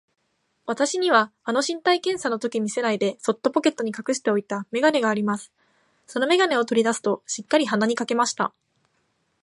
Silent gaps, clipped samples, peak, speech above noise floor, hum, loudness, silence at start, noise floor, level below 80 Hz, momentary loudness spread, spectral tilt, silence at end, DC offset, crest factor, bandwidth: none; under 0.1%; -4 dBFS; 48 dB; none; -23 LUFS; 0.65 s; -70 dBFS; -74 dBFS; 8 LU; -3.5 dB/octave; 0.95 s; under 0.1%; 20 dB; 11.5 kHz